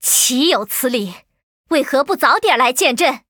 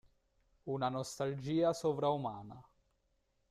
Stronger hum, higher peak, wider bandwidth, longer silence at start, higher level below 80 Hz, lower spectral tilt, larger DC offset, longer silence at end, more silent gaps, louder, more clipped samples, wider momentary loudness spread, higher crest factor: neither; first, 0 dBFS vs -20 dBFS; first, over 20 kHz vs 14 kHz; second, 0 s vs 0.65 s; first, -64 dBFS vs -70 dBFS; second, -1 dB/octave vs -6 dB/octave; neither; second, 0.1 s vs 0.9 s; first, 1.43-1.64 s vs none; first, -15 LUFS vs -36 LUFS; neither; second, 7 LU vs 16 LU; about the same, 16 dB vs 18 dB